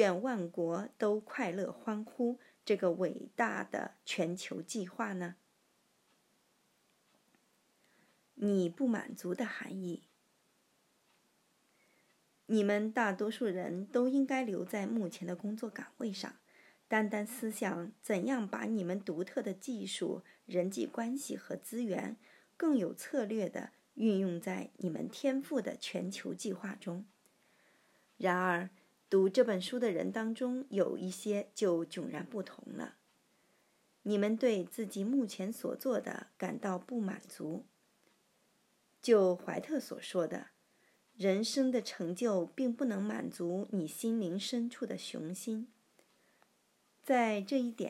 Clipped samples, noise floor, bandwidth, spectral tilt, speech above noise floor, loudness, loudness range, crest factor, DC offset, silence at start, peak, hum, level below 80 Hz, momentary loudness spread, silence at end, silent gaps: under 0.1%; -74 dBFS; 16 kHz; -5.5 dB/octave; 39 dB; -36 LUFS; 6 LU; 22 dB; under 0.1%; 0 s; -16 dBFS; none; under -90 dBFS; 11 LU; 0 s; none